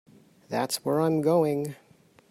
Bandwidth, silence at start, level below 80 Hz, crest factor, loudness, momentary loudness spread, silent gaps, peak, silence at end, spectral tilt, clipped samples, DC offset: 16 kHz; 0.5 s; -70 dBFS; 16 dB; -26 LUFS; 10 LU; none; -12 dBFS; 0.55 s; -5.5 dB/octave; under 0.1%; under 0.1%